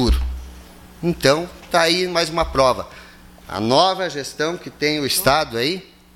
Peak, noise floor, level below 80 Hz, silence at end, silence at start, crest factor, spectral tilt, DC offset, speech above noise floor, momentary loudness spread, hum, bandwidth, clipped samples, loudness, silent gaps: 0 dBFS; -43 dBFS; -32 dBFS; 0.35 s; 0 s; 20 dB; -4 dB/octave; under 0.1%; 24 dB; 11 LU; none; 17 kHz; under 0.1%; -19 LUFS; none